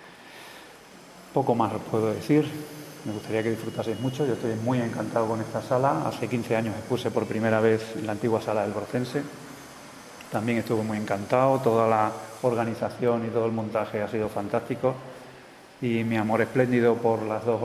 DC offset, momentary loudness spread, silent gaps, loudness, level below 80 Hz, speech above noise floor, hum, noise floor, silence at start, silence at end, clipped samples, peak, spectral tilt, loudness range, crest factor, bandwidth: under 0.1%; 20 LU; none; -26 LUFS; -64 dBFS; 23 dB; none; -48 dBFS; 0 s; 0 s; under 0.1%; -6 dBFS; -6.5 dB/octave; 4 LU; 20 dB; 14 kHz